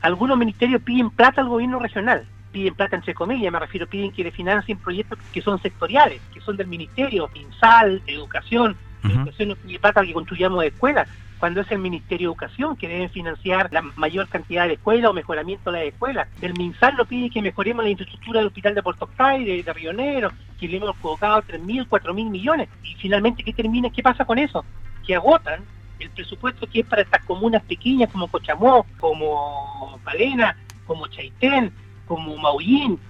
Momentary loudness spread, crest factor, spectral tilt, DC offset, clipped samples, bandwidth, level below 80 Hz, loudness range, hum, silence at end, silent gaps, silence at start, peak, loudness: 12 LU; 20 dB; -7 dB/octave; under 0.1%; under 0.1%; 8 kHz; -44 dBFS; 5 LU; none; 0 s; none; 0 s; 0 dBFS; -21 LUFS